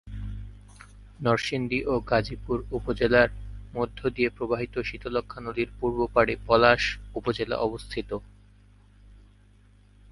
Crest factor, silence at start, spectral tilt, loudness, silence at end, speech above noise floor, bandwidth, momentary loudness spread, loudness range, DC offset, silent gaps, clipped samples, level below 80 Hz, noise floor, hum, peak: 24 dB; 0.05 s; -6 dB/octave; -26 LUFS; 0.9 s; 30 dB; 11.5 kHz; 16 LU; 3 LU; under 0.1%; none; under 0.1%; -44 dBFS; -56 dBFS; 50 Hz at -45 dBFS; -2 dBFS